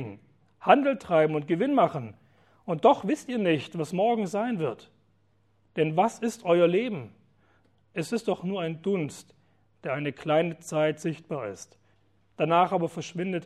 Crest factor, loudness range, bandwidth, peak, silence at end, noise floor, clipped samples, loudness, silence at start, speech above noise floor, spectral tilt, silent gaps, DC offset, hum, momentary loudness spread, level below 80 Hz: 22 dB; 6 LU; 13 kHz; -4 dBFS; 0 s; -68 dBFS; under 0.1%; -27 LUFS; 0 s; 42 dB; -6 dB/octave; none; under 0.1%; none; 16 LU; -72 dBFS